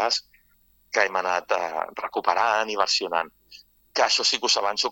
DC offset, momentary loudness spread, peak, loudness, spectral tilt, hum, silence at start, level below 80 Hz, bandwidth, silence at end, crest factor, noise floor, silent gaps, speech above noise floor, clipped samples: under 0.1%; 9 LU; -4 dBFS; -23 LUFS; 0 dB/octave; none; 0 s; -68 dBFS; 17.5 kHz; 0 s; 22 dB; -62 dBFS; none; 38 dB; under 0.1%